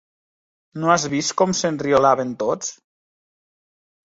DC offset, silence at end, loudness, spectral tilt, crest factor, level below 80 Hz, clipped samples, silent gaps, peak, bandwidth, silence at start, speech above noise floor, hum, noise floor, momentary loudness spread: under 0.1%; 1.45 s; -20 LUFS; -4 dB/octave; 20 dB; -60 dBFS; under 0.1%; none; -2 dBFS; 8 kHz; 0.75 s; over 71 dB; none; under -90 dBFS; 10 LU